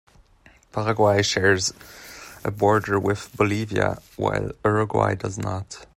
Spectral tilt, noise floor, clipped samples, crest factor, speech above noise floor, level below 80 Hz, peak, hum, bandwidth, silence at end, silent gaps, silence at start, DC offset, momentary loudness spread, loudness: -5 dB/octave; -55 dBFS; under 0.1%; 18 dB; 32 dB; -50 dBFS; -6 dBFS; none; 16 kHz; 0.15 s; none; 0.75 s; under 0.1%; 14 LU; -23 LUFS